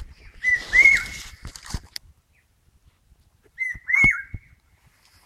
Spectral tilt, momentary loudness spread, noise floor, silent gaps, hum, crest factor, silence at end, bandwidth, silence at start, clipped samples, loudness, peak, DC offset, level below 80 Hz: -2.5 dB/octave; 25 LU; -63 dBFS; none; none; 20 dB; 0.9 s; 15 kHz; 0 s; under 0.1%; -18 LUFS; -4 dBFS; under 0.1%; -44 dBFS